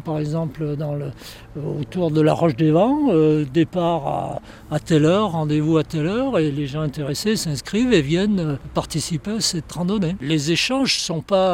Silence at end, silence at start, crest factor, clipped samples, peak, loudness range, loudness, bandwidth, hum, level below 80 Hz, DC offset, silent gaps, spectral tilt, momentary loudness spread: 0 s; 0 s; 16 dB; under 0.1%; -4 dBFS; 2 LU; -20 LUFS; 16.5 kHz; none; -46 dBFS; under 0.1%; none; -5.5 dB/octave; 10 LU